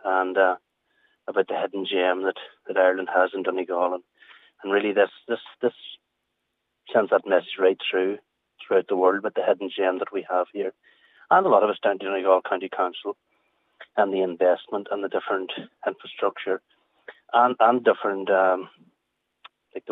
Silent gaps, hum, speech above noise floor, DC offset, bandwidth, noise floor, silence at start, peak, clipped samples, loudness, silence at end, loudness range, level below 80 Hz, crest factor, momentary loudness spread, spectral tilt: none; none; 55 dB; under 0.1%; 4 kHz; -78 dBFS; 0.05 s; -4 dBFS; under 0.1%; -24 LUFS; 0 s; 4 LU; -88 dBFS; 20 dB; 11 LU; -7 dB/octave